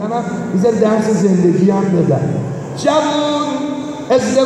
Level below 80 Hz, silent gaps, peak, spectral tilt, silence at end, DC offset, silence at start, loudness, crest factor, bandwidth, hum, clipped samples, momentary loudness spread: -52 dBFS; none; -2 dBFS; -6.5 dB/octave; 0 s; under 0.1%; 0 s; -15 LUFS; 12 dB; 11 kHz; none; under 0.1%; 8 LU